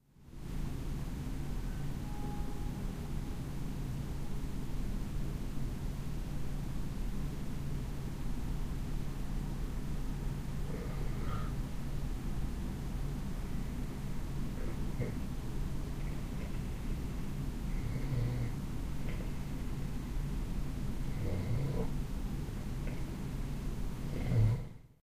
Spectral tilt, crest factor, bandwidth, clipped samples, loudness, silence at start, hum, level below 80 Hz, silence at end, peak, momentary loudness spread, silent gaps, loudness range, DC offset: -7 dB/octave; 18 dB; 15.5 kHz; under 0.1%; -40 LUFS; 0.2 s; none; -40 dBFS; 0.15 s; -18 dBFS; 5 LU; none; 2 LU; under 0.1%